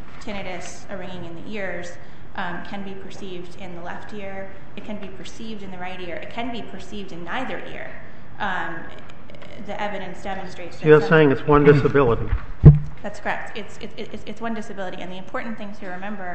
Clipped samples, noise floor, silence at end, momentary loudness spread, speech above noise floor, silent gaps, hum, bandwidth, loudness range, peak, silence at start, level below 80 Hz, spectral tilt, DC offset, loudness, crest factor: under 0.1%; -41 dBFS; 0 s; 22 LU; 19 dB; none; none; 8.4 kHz; 17 LU; 0 dBFS; 0 s; -36 dBFS; -7.5 dB/octave; 5%; -21 LUFS; 24 dB